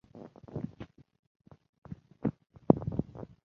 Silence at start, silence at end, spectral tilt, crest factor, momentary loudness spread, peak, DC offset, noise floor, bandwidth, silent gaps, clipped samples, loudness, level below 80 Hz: 0.15 s; 0.2 s; -11 dB/octave; 34 dB; 23 LU; -2 dBFS; under 0.1%; -51 dBFS; 6.2 kHz; 1.19-1.40 s, 1.69-1.82 s; under 0.1%; -33 LUFS; -56 dBFS